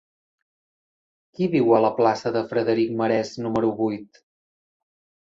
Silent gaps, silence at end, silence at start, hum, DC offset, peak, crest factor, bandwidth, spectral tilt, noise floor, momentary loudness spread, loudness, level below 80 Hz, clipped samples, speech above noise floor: none; 1.25 s; 1.4 s; none; under 0.1%; -4 dBFS; 20 dB; 7.6 kHz; -7 dB/octave; under -90 dBFS; 9 LU; -22 LUFS; -64 dBFS; under 0.1%; over 68 dB